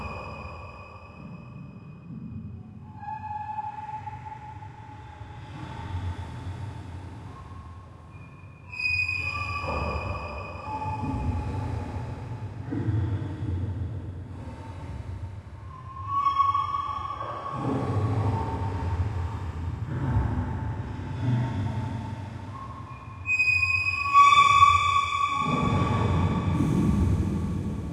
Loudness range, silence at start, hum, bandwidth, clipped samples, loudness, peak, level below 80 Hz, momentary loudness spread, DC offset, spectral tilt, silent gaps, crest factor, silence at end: 18 LU; 0 s; none; 11 kHz; under 0.1%; -26 LUFS; -6 dBFS; -42 dBFS; 20 LU; under 0.1%; -6 dB/octave; none; 22 dB; 0 s